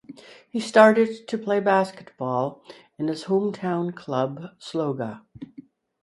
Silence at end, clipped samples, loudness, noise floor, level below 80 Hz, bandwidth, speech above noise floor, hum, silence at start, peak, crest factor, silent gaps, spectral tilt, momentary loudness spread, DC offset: 0.6 s; under 0.1%; -24 LUFS; -48 dBFS; -70 dBFS; 11.5 kHz; 25 dB; none; 0.1 s; 0 dBFS; 24 dB; none; -6 dB/octave; 18 LU; under 0.1%